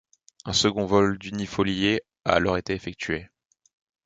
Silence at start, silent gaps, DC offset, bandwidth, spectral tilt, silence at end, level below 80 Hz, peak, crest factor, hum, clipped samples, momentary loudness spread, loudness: 0.45 s; none; under 0.1%; 9.4 kHz; -4.5 dB/octave; 0.8 s; -48 dBFS; -4 dBFS; 22 dB; none; under 0.1%; 9 LU; -25 LUFS